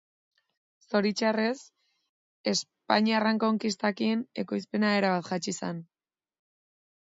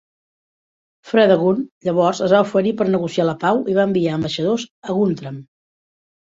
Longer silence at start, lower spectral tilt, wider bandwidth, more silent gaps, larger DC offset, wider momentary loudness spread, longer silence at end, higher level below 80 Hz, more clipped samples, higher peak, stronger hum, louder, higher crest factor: second, 0.9 s vs 1.05 s; second, -4.5 dB/octave vs -6.5 dB/octave; about the same, 7.8 kHz vs 7.8 kHz; first, 2.09-2.44 s vs 1.71-1.81 s, 4.71-4.82 s; neither; about the same, 9 LU vs 8 LU; first, 1.3 s vs 0.95 s; second, -76 dBFS vs -60 dBFS; neither; second, -6 dBFS vs -2 dBFS; neither; second, -28 LUFS vs -18 LUFS; first, 24 dB vs 18 dB